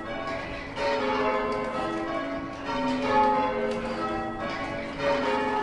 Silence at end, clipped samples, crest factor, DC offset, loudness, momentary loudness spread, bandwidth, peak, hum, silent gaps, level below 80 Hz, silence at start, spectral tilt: 0 s; under 0.1%; 16 dB; under 0.1%; -28 LUFS; 9 LU; 11 kHz; -12 dBFS; none; none; -48 dBFS; 0 s; -5.5 dB/octave